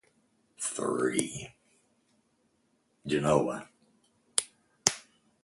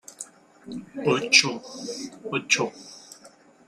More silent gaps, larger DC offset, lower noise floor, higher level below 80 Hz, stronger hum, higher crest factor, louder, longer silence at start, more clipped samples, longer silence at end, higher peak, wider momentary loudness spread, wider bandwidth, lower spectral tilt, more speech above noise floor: neither; neither; first, -73 dBFS vs -53 dBFS; first, -64 dBFS vs -70 dBFS; neither; first, 34 dB vs 26 dB; second, -30 LUFS vs -22 LUFS; first, 0.6 s vs 0.1 s; neither; about the same, 0.4 s vs 0.4 s; about the same, 0 dBFS vs -2 dBFS; second, 17 LU vs 24 LU; about the same, 16 kHz vs 15.5 kHz; first, -3.5 dB/octave vs -2 dB/octave; first, 43 dB vs 27 dB